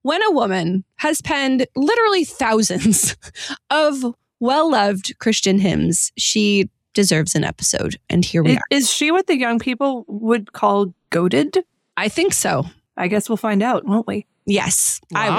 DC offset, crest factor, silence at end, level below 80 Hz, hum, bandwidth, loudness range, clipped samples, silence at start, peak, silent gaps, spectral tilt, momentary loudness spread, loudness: under 0.1%; 14 dB; 0 s; -50 dBFS; none; 16.5 kHz; 2 LU; under 0.1%; 0.05 s; -4 dBFS; none; -4 dB/octave; 7 LU; -18 LUFS